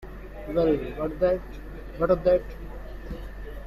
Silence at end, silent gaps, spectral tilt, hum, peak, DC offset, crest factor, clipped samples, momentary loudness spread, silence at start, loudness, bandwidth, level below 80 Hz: 0 s; none; -8.5 dB/octave; none; -10 dBFS; under 0.1%; 18 dB; under 0.1%; 18 LU; 0 s; -25 LUFS; 13.5 kHz; -38 dBFS